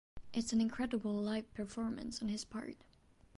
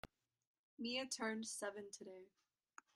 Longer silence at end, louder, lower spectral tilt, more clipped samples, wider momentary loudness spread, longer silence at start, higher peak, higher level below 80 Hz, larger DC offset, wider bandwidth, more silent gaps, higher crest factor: about the same, 0.6 s vs 0.65 s; first, -39 LUFS vs -46 LUFS; first, -5 dB/octave vs -2 dB/octave; neither; second, 11 LU vs 19 LU; about the same, 0.15 s vs 0.05 s; first, -24 dBFS vs -30 dBFS; first, -62 dBFS vs -80 dBFS; neither; second, 11.5 kHz vs 13 kHz; second, none vs 0.47-0.77 s; about the same, 16 dB vs 20 dB